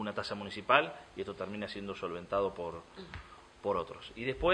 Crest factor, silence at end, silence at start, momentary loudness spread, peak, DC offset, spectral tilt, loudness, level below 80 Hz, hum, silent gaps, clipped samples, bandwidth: 28 dB; 0 s; 0 s; 20 LU; -8 dBFS; under 0.1%; -5.5 dB/octave; -35 LUFS; -56 dBFS; none; none; under 0.1%; 10.5 kHz